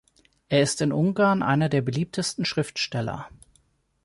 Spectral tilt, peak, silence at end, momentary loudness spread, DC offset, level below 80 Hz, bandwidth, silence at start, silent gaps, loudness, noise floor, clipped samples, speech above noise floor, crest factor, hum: -5 dB/octave; -8 dBFS; 0.75 s; 9 LU; under 0.1%; -58 dBFS; 11.5 kHz; 0.5 s; none; -24 LUFS; -65 dBFS; under 0.1%; 41 dB; 16 dB; none